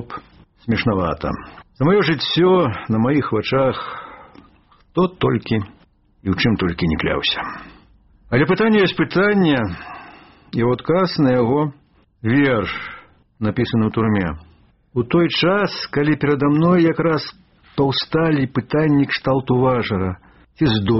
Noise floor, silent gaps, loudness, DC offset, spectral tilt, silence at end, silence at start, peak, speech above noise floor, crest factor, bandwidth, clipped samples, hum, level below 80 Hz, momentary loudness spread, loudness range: -53 dBFS; none; -18 LUFS; 0.1%; -5 dB/octave; 0 s; 0 s; -2 dBFS; 35 dB; 16 dB; 6 kHz; under 0.1%; none; -44 dBFS; 14 LU; 3 LU